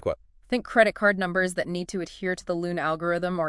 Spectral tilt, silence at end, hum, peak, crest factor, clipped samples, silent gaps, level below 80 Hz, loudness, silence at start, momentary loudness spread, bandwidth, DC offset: -5.5 dB/octave; 0 s; none; -4 dBFS; 22 dB; under 0.1%; none; -54 dBFS; -26 LUFS; 0.05 s; 10 LU; 12 kHz; under 0.1%